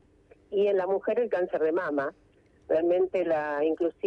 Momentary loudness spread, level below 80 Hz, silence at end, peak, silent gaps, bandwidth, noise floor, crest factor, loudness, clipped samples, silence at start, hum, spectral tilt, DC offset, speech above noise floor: 5 LU; -66 dBFS; 0 s; -16 dBFS; none; 6 kHz; -59 dBFS; 12 dB; -27 LUFS; under 0.1%; 0.5 s; none; -7.5 dB/octave; under 0.1%; 33 dB